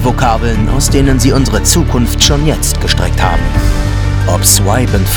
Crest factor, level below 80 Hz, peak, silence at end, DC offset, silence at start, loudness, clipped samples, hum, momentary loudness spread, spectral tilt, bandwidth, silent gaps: 10 dB; -14 dBFS; 0 dBFS; 0 s; under 0.1%; 0 s; -11 LUFS; 0.7%; none; 5 LU; -4 dB/octave; over 20 kHz; none